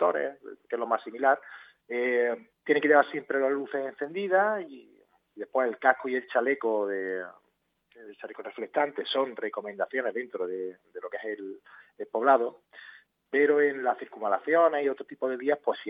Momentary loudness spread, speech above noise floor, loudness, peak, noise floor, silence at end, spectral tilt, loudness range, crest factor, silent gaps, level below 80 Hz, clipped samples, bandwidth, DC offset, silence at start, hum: 18 LU; 43 dB; -28 LUFS; -6 dBFS; -71 dBFS; 0 s; -7 dB/octave; 6 LU; 24 dB; none; -88 dBFS; under 0.1%; 5 kHz; under 0.1%; 0 s; none